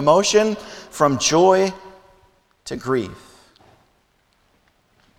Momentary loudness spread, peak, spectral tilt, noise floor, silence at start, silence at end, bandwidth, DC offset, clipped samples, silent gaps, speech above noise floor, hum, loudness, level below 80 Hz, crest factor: 20 LU; -2 dBFS; -4 dB/octave; -62 dBFS; 0 s; 2.05 s; 15.5 kHz; under 0.1%; under 0.1%; none; 45 dB; none; -18 LUFS; -56 dBFS; 20 dB